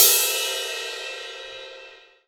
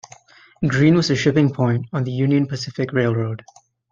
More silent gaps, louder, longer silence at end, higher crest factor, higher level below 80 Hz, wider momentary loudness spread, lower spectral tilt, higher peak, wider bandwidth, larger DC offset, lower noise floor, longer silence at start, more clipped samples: neither; second, -22 LUFS vs -19 LUFS; second, 0.3 s vs 0.55 s; first, 24 dB vs 16 dB; second, -70 dBFS vs -56 dBFS; first, 21 LU vs 10 LU; second, 3.5 dB/octave vs -6.5 dB/octave; about the same, 0 dBFS vs -2 dBFS; first, over 20 kHz vs 7.6 kHz; neither; about the same, -47 dBFS vs -48 dBFS; second, 0 s vs 0.6 s; neither